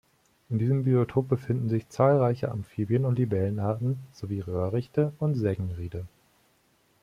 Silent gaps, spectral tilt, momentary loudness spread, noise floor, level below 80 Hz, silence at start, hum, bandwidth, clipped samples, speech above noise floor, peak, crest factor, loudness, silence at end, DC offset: none; -9.5 dB/octave; 11 LU; -66 dBFS; -58 dBFS; 0.5 s; none; 10 kHz; under 0.1%; 40 dB; -8 dBFS; 18 dB; -27 LUFS; 0.95 s; under 0.1%